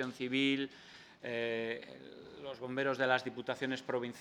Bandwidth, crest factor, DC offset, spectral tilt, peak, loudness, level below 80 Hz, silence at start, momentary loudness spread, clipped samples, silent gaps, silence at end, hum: 11.5 kHz; 22 dB; under 0.1%; -5 dB/octave; -14 dBFS; -36 LUFS; -78 dBFS; 0 s; 19 LU; under 0.1%; none; 0 s; none